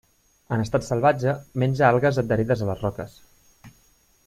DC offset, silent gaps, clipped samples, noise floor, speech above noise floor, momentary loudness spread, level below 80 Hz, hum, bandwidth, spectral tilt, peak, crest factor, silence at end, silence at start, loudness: under 0.1%; none; under 0.1%; -60 dBFS; 38 dB; 11 LU; -50 dBFS; none; 14 kHz; -7.5 dB/octave; -4 dBFS; 20 dB; 0.6 s; 0.5 s; -23 LUFS